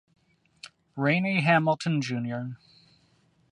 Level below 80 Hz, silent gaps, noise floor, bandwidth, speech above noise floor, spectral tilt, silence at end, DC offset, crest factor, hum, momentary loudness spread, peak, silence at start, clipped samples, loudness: -72 dBFS; none; -65 dBFS; 10.5 kHz; 40 dB; -6.5 dB/octave; 0.95 s; under 0.1%; 20 dB; none; 25 LU; -8 dBFS; 0.65 s; under 0.1%; -26 LUFS